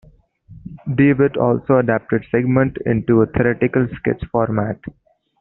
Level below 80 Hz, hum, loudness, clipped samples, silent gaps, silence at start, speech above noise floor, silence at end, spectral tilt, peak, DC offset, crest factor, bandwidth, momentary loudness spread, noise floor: -44 dBFS; none; -18 LUFS; under 0.1%; none; 0.5 s; 30 dB; 0.5 s; -8.5 dB/octave; -2 dBFS; under 0.1%; 16 dB; 4.1 kHz; 10 LU; -47 dBFS